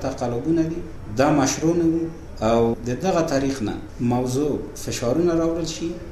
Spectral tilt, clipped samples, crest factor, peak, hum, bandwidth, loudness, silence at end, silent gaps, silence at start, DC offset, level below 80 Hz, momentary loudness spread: -5.5 dB/octave; under 0.1%; 16 dB; -6 dBFS; none; 13.5 kHz; -22 LUFS; 0 s; none; 0 s; under 0.1%; -40 dBFS; 9 LU